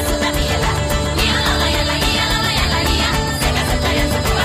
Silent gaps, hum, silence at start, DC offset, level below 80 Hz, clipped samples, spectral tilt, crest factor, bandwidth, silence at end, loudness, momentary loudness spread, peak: none; none; 0 s; under 0.1%; -22 dBFS; under 0.1%; -4 dB/octave; 12 dB; 15.5 kHz; 0 s; -16 LUFS; 2 LU; -4 dBFS